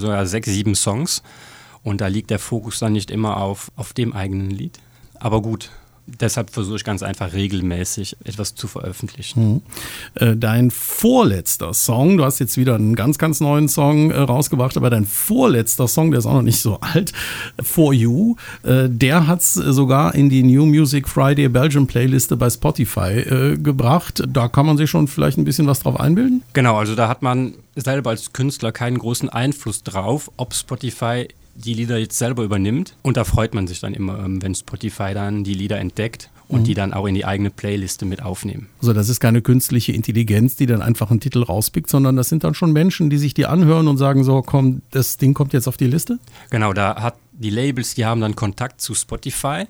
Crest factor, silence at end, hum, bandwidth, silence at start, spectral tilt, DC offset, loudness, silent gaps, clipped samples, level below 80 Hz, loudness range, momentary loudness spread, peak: 18 dB; 0.05 s; none; over 20 kHz; 0 s; -5.5 dB/octave; under 0.1%; -18 LUFS; none; under 0.1%; -42 dBFS; 8 LU; 11 LU; 0 dBFS